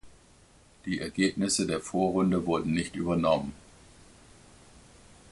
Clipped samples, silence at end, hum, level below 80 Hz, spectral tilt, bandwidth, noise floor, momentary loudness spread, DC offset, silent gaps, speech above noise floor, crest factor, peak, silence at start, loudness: under 0.1%; 1.75 s; none; -54 dBFS; -5 dB/octave; 11.5 kHz; -58 dBFS; 8 LU; under 0.1%; none; 30 dB; 18 dB; -12 dBFS; 0.05 s; -28 LUFS